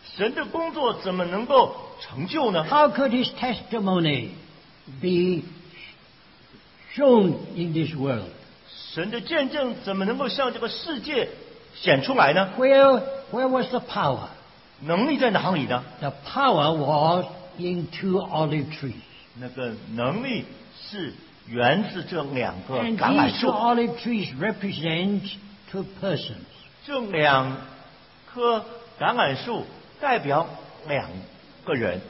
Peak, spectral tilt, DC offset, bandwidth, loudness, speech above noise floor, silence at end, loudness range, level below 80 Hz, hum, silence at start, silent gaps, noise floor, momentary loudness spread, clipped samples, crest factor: -4 dBFS; -10 dB/octave; under 0.1%; 5.8 kHz; -24 LUFS; 29 dB; 0 s; 7 LU; -58 dBFS; none; 0.05 s; none; -53 dBFS; 18 LU; under 0.1%; 20 dB